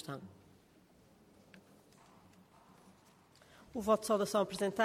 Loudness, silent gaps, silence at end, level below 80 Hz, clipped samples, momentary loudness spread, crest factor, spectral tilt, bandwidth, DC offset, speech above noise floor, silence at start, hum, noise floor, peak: -35 LUFS; none; 0 s; -72 dBFS; under 0.1%; 17 LU; 22 dB; -4.5 dB/octave; 16 kHz; under 0.1%; 31 dB; 0 s; none; -65 dBFS; -16 dBFS